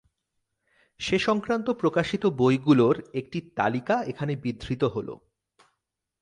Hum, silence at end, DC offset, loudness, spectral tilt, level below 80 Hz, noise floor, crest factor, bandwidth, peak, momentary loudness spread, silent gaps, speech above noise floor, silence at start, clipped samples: none; 1.05 s; under 0.1%; -26 LUFS; -6.5 dB/octave; -56 dBFS; -82 dBFS; 20 dB; 10.5 kHz; -8 dBFS; 13 LU; none; 57 dB; 1 s; under 0.1%